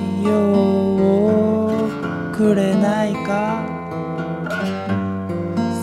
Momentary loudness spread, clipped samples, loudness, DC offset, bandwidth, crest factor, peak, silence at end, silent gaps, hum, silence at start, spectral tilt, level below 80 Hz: 9 LU; under 0.1%; -19 LUFS; under 0.1%; 12 kHz; 14 dB; -6 dBFS; 0 s; none; none; 0 s; -7.5 dB/octave; -52 dBFS